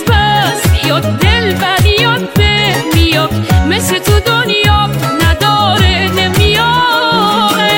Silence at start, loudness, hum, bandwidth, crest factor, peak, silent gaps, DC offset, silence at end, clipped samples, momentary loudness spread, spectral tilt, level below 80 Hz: 0 s; -10 LUFS; none; 17 kHz; 10 dB; 0 dBFS; none; 0.3%; 0 s; under 0.1%; 3 LU; -4.5 dB/octave; -20 dBFS